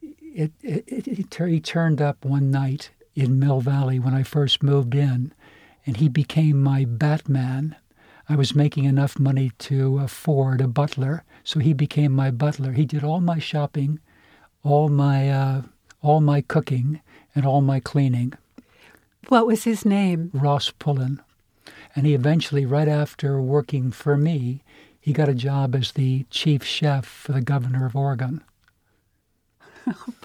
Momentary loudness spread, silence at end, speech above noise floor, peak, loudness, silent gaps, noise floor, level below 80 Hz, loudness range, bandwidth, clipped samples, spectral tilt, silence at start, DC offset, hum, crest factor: 10 LU; 0.15 s; 48 dB; -4 dBFS; -22 LUFS; none; -68 dBFS; -60 dBFS; 2 LU; 13 kHz; under 0.1%; -7.5 dB/octave; 0 s; under 0.1%; none; 18 dB